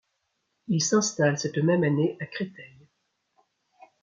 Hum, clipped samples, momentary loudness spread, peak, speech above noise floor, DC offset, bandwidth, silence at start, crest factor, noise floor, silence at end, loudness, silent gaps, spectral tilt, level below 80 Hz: none; under 0.1%; 12 LU; -10 dBFS; 52 dB; under 0.1%; 7.4 kHz; 0.7 s; 18 dB; -77 dBFS; 1.35 s; -25 LUFS; none; -5 dB/octave; -72 dBFS